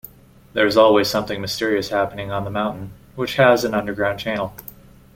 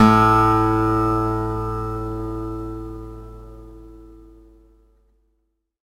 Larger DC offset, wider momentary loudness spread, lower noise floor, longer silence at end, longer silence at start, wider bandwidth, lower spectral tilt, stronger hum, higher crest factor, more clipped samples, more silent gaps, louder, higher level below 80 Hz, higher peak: neither; second, 15 LU vs 25 LU; second, -44 dBFS vs -71 dBFS; second, 0.55 s vs 1.7 s; first, 0.55 s vs 0 s; about the same, 17 kHz vs 15.5 kHz; second, -5 dB/octave vs -7.5 dB/octave; neither; about the same, 18 dB vs 20 dB; neither; neither; about the same, -19 LUFS vs -20 LUFS; second, -50 dBFS vs -36 dBFS; about the same, -2 dBFS vs 0 dBFS